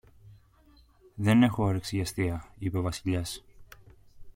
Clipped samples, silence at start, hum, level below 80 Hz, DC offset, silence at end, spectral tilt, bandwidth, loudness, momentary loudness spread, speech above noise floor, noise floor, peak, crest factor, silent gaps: under 0.1%; 0.25 s; none; -52 dBFS; under 0.1%; 0.05 s; -6 dB/octave; 16.5 kHz; -28 LUFS; 14 LU; 32 dB; -60 dBFS; -10 dBFS; 20 dB; none